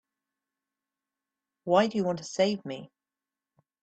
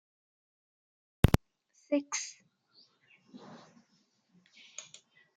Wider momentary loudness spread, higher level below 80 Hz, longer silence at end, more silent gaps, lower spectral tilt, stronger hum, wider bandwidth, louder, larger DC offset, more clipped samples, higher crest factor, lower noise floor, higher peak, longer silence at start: second, 17 LU vs 27 LU; second, -72 dBFS vs -46 dBFS; first, 1 s vs 0.55 s; neither; about the same, -5 dB/octave vs -5.5 dB/octave; neither; second, 8.8 kHz vs 10 kHz; first, -27 LUFS vs -32 LUFS; neither; neither; second, 22 dB vs 30 dB; first, under -90 dBFS vs -73 dBFS; second, -10 dBFS vs -6 dBFS; first, 1.65 s vs 1.25 s